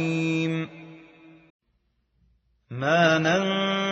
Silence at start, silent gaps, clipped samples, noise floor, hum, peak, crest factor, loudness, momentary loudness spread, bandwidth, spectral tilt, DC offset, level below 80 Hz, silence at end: 0 s; 1.50-1.59 s; under 0.1%; -71 dBFS; none; -10 dBFS; 18 dB; -23 LUFS; 18 LU; 8 kHz; -4 dB/octave; under 0.1%; -68 dBFS; 0 s